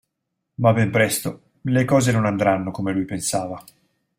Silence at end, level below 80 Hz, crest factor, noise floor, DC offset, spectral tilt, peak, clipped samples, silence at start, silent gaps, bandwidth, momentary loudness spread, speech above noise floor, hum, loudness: 0.55 s; -56 dBFS; 18 dB; -78 dBFS; under 0.1%; -5.5 dB/octave; -4 dBFS; under 0.1%; 0.6 s; none; 16.5 kHz; 14 LU; 58 dB; none; -20 LUFS